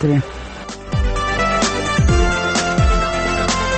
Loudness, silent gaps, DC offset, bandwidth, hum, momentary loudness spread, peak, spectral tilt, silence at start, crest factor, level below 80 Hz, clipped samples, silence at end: -17 LUFS; none; under 0.1%; 8.8 kHz; none; 12 LU; -4 dBFS; -4.5 dB/octave; 0 s; 14 dB; -22 dBFS; under 0.1%; 0 s